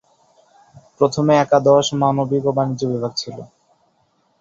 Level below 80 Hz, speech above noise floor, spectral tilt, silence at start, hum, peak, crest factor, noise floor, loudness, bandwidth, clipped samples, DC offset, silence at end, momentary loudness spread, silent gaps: -58 dBFS; 46 dB; -6 dB/octave; 1 s; none; -2 dBFS; 18 dB; -63 dBFS; -17 LUFS; 7.8 kHz; under 0.1%; under 0.1%; 0.95 s; 12 LU; none